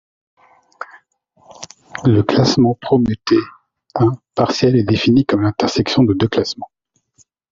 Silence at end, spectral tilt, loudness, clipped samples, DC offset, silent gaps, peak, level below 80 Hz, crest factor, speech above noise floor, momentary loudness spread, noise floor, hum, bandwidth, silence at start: 0.85 s; -6.5 dB/octave; -16 LUFS; under 0.1%; under 0.1%; none; -2 dBFS; -48 dBFS; 16 dB; 42 dB; 21 LU; -57 dBFS; none; 7.6 kHz; 0.8 s